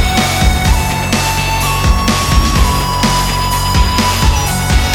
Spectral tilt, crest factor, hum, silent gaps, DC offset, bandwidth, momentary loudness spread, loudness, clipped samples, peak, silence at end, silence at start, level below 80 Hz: -4 dB/octave; 12 dB; none; none; under 0.1%; 19.5 kHz; 2 LU; -12 LUFS; under 0.1%; 0 dBFS; 0 s; 0 s; -16 dBFS